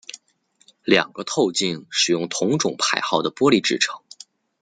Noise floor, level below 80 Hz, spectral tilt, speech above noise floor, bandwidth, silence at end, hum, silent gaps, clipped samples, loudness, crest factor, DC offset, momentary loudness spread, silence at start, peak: -63 dBFS; -64 dBFS; -3 dB/octave; 42 dB; 9.6 kHz; 0.65 s; none; none; under 0.1%; -20 LUFS; 22 dB; under 0.1%; 6 LU; 0.15 s; 0 dBFS